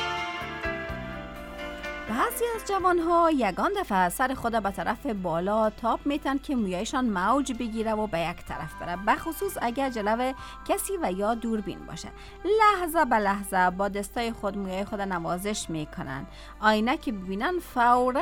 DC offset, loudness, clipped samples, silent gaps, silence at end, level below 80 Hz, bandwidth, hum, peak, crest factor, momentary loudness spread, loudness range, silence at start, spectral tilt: under 0.1%; -27 LUFS; under 0.1%; none; 0 s; -46 dBFS; 19 kHz; none; -8 dBFS; 18 dB; 13 LU; 4 LU; 0 s; -4.5 dB/octave